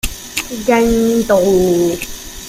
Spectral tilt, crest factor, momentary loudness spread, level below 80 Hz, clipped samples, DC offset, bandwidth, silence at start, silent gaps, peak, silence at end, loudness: -4.5 dB/octave; 14 dB; 10 LU; -32 dBFS; under 0.1%; under 0.1%; 16 kHz; 0.05 s; none; -2 dBFS; 0 s; -14 LUFS